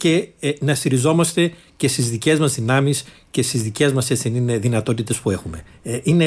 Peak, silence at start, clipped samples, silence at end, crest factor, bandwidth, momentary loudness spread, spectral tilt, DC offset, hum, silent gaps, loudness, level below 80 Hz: -4 dBFS; 0 s; under 0.1%; 0 s; 14 dB; 11 kHz; 8 LU; -5 dB/octave; under 0.1%; none; none; -19 LUFS; -50 dBFS